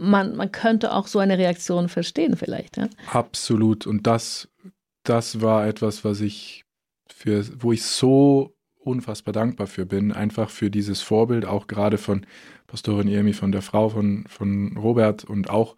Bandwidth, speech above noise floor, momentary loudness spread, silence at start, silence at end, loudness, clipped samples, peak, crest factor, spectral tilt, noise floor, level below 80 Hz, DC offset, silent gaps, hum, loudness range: 14 kHz; 28 dB; 9 LU; 0 s; 0.05 s; -22 LUFS; under 0.1%; -4 dBFS; 18 dB; -6 dB/octave; -50 dBFS; -60 dBFS; under 0.1%; none; none; 3 LU